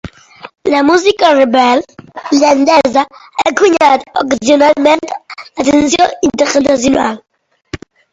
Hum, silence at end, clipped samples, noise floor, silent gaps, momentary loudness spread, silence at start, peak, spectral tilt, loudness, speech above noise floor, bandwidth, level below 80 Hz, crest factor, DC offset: none; 0.35 s; 0.1%; -32 dBFS; none; 18 LU; 0.05 s; 0 dBFS; -3.5 dB/octave; -10 LUFS; 22 dB; 8 kHz; -44 dBFS; 12 dB; under 0.1%